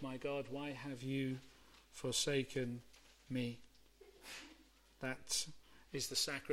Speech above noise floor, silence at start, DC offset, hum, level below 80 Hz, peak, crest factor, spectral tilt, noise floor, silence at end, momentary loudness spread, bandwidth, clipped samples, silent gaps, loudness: 24 dB; 0 s; under 0.1%; none; -68 dBFS; -24 dBFS; 20 dB; -3.5 dB/octave; -66 dBFS; 0 s; 15 LU; 16.5 kHz; under 0.1%; none; -42 LUFS